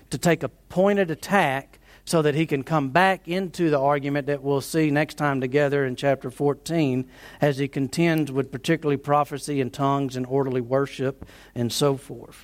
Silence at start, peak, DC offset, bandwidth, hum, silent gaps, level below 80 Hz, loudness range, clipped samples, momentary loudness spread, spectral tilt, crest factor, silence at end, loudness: 0.1 s; -4 dBFS; under 0.1%; 16.5 kHz; none; none; -56 dBFS; 2 LU; under 0.1%; 7 LU; -6 dB/octave; 18 dB; 0.05 s; -24 LUFS